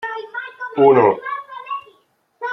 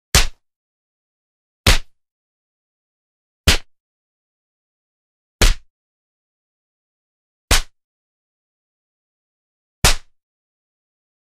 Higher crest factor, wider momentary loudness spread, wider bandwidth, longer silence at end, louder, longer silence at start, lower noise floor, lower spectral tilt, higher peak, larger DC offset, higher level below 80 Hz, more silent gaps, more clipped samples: about the same, 18 dB vs 22 dB; first, 18 LU vs 7 LU; second, 5.8 kHz vs 15.5 kHz; second, 0 s vs 1.25 s; about the same, -17 LUFS vs -18 LUFS; second, 0 s vs 0.15 s; second, -60 dBFS vs under -90 dBFS; first, -8.5 dB/octave vs -2.5 dB/octave; about the same, -2 dBFS vs 0 dBFS; neither; second, -66 dBFS vs -26 dBFS; second, none vs 0.56-1.64 s, 2.11-3.44 s, 3.80-5.39 s, 5.70-7.48 s, 7.84-9.82 s; neither